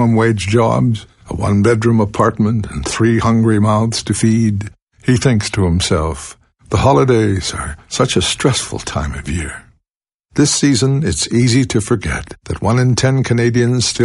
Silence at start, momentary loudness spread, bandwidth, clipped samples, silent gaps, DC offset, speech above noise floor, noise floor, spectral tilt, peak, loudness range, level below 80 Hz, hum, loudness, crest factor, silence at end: 0 s; 10 LU; 11.5 kHz; under 0.1%; 4.82-4.87 s, 9.95-10.01 s, 10.14-10.23 s; under 0.1%; 68 dB; -82 dBFS; -5.5 dB/octave; 0 dBFS; 2 LU; -34 dBFS; none; -15 LUFS; 14 dB; 0 s